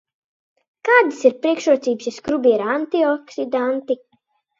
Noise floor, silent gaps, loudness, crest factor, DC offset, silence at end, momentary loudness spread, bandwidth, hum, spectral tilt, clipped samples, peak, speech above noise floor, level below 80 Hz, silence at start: -66 dBFS; none; -19 LUFS; 20 dB; under 0.1%; 0.65 s; 10 LU; 7.8 kHz; none; -4 dB/octave; under 0.1%; 0 dBFS; 47 dB; -66 dBFS; 0.85 s